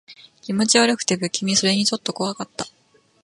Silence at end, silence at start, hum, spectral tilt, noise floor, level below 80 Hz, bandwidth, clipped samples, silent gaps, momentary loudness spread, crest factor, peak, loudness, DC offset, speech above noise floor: 0.55 s; 0.1 s; none; -3 dB/octave; -59 dBFS; -64 dBFS; 11.5 kHz; under 0.1%; none; 16 LU; 20 dB; -2 dBFS; -20 LUFS; under 0.1%; 39 dB